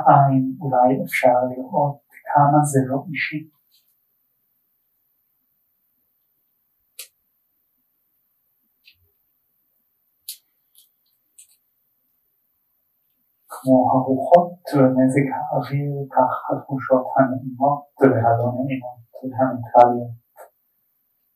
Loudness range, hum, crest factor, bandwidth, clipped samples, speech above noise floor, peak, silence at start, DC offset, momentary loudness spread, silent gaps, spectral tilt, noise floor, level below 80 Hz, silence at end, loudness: 7 LU; none; 22 dB; 15.5 kHz; under 0.1%; 51 dB; 0 dBFS; 0 s; under 0.1%; 21 LU; none; -7.5 dB/octave; -69 dBFS; -70 dBFS; 0.9 s; -19 LUFS